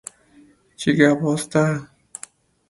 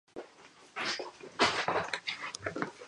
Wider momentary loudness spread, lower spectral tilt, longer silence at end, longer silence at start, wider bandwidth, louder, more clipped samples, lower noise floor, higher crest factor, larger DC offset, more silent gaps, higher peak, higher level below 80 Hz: first, 23 LU vs 19 LU; first, -5.5 dB/octave vs -2.5 dB/octave; first, 0.85 s vs 0 s; first, 0.8 s vs 0.15 s; about the same, 11.5 kHz vs 11.5 kHz; first, -20 LUFS vs -33 LUFS; neither; second, -53 dBFS vs -57 dBFS; about the same, 22 dB vs 24 dB; neither; neither; first, 0 dBFS vs -12 dBFS; first, -58 dBFS vs -68 dBFS